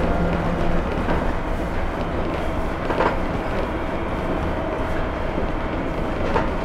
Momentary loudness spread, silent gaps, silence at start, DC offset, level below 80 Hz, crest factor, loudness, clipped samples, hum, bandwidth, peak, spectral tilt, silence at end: 4 LU; none; 0 s; under 0.1%; -26 dBFS; 16 dB; -24 LUFS; under 0.1%; none; 10.5 kHz; -6 dBFS; -7.5 dB/octave; 0 s